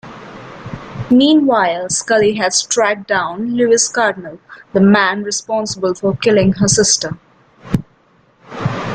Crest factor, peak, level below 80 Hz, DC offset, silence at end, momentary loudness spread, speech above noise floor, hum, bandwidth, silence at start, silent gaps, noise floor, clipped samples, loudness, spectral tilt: 14 dB; -2 dBFS; -46 dBFS; under 0.1%; 0 s; 20 LU; 39 dB; none; 9.6 kHz; 0.05 s; none; -53 dBFS; under 0.1%; -14 LUFS; -4 dB/octave